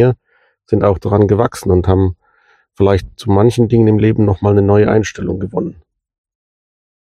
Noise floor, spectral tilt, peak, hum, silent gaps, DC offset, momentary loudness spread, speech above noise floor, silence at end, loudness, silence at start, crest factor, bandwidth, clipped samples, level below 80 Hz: -58 dBFS; -8 dB/octave; 0 dBFS; none; none; under 0.1%; 9 LU; 46 dB; 1.35 s; -13 LUFS; 0 s; 14 dB; 12.5 kHz; under 0.1%; -36 dBFS